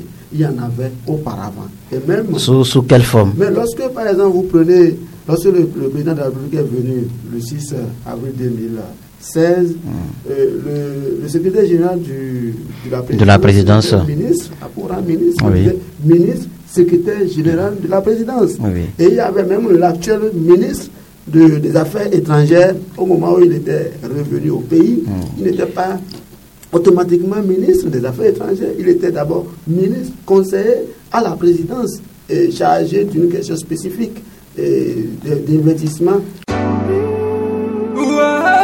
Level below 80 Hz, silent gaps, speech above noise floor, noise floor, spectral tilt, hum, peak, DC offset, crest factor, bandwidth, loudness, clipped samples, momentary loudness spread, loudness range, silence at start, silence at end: -42 dBFS; none; 26 dB; -40 dBFS; -7 dB/octave; none; 0 dBFS; under 0.1%; 14 dB; 17 kHz; -14 LUFS; under 0.1%; 13 LU; 5 LU; 0 s; 0 s